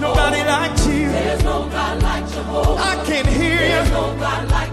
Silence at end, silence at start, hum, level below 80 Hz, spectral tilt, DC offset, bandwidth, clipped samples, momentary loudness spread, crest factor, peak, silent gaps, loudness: 0 s; 0 s; none; -22 dBFS; -5 dB/octave; under 0.1%; 14 kHz; under 0.1%; 5 LU; 14 dB; -4 dBFS; none; -18 LUFS